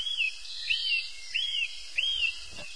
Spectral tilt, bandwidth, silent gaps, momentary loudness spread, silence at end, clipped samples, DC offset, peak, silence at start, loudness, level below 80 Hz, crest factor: 2 dB/octave; 10.5 kHz; none; 6 LU; 0 s; under 0.1%; 0.7%; -16 dBFS; 0 s; -29 LUFS; -58 dBFS; 16 dB